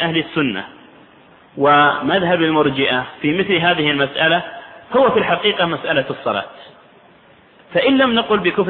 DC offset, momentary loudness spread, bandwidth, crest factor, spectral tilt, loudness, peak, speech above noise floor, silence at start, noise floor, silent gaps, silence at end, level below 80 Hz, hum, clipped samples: under 0.1%; 9 LU; 4.4 kHz; 16 dB; -8.5 dB/octave; -16 LUFS; -2 dBFS; 32 dB; 0 s; -48 dBFS; none; 0 s; -54 dBFS; none; under 0.1%